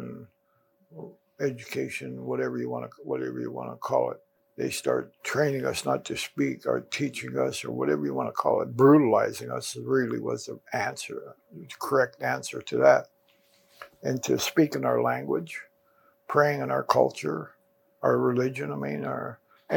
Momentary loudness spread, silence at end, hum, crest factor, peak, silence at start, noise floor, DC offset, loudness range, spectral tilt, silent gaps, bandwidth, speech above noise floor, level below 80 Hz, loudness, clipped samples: 14 LU; 0 s; none; 22 dB; -4 dBFS; 0 s; -69 dBFS; under 0.1%; 7 LU; -5.5 dB/octave; none; 19 kHz; 43 dB; -74 dBFS; -27 LUFS; under 0.1%